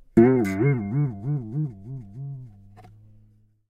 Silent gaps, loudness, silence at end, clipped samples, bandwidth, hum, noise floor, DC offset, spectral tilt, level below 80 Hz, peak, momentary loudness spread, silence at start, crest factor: none; -23 LUFS; 0.9 s; under 0.1%; 12.5 kHz; none; -58 dBFS; under 0.1%; -9.5 dB/octave; -54 dBFS; -4 dBFS; 20 LU; 0.15 s; 22 dB